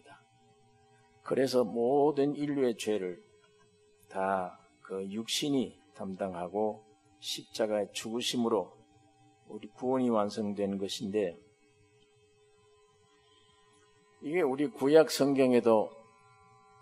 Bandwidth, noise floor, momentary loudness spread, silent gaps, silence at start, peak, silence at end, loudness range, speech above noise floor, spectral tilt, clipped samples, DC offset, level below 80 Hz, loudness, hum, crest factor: 13 kHz; -65 dBFS; 17 LU; none; 0.1 s; -10 dBFS; 0.8 s; 9 LU; 35 dB; -5 dB/octave; under 0.1%; under 0.1%; -80 dBFS; -31 LUFS; none; 22 dB